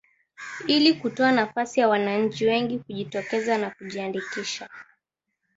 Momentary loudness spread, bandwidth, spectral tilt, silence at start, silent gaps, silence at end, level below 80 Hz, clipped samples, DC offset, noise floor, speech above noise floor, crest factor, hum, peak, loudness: 13 LU; 8 kHz; -4.5 dB/octave; 0.4 s; none; 0.75 s; -68 dBFS; under 0.1%; under 0.1%; -81 dBFS; 56 dB; 20 dB; none; -6 dBFS; -24 LUFS